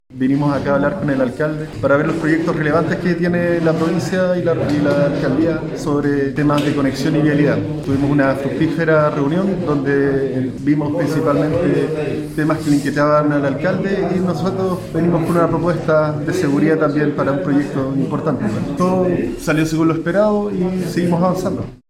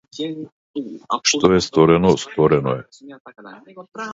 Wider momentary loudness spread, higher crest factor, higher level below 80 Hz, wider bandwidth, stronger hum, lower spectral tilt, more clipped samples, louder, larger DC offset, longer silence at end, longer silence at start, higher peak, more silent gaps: second, 5 LU vs 17 LU; second, 14 dB vs 20 dB; about the same, -42 dBFS vs -46 dBFS; first, 14.5 kHz vs 7.8 kHz; neither; first, -7.5 dB/octave vs -5 dB/octave; neither; about the same, -17 LUFS vs -17 LUFS; neither; first, 0.15 s vs 0 s; about the same, 0.1 s vs 0.15 s; about the same, -2 dBFS vs 0 dBFS; second, none vs 0.52-0.74 s, 3.20-3.25 s